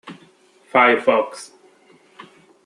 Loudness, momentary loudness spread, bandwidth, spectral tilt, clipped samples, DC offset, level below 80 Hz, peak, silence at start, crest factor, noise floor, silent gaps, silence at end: -17 LUFS; 16 LU; 12 kHz; -4 dB/octave; under 0.1%; under 0.1%; -76 dBFS; -2 dBFS; 0.05 s; 20 dB; -53 dBFS; none; 1.2 s